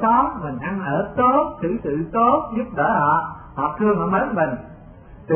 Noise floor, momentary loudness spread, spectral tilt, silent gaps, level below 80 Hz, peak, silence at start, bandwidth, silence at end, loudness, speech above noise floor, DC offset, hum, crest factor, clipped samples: -42 dBFS; 9 LU; -12 dB/octave; none; -46 dBFS; -6 dBFS; 0 s; 3.4 kHz; 0 s; -20 LUFS; 22 dB; under 0.1%; none; 16 dB; under 0.1%